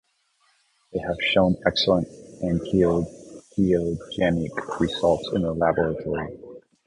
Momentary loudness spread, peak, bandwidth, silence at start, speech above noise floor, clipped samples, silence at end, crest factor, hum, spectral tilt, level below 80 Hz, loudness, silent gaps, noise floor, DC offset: 13 LU; -4 dBFS; 10.5 kHz; 0.95 s; 44 dB; under 0.1%; 0.3 s; 20 dB; none; -6.5 dB/octave; -46 dBFS; -24 LUFS; none; -66 dBFS; under 0.1%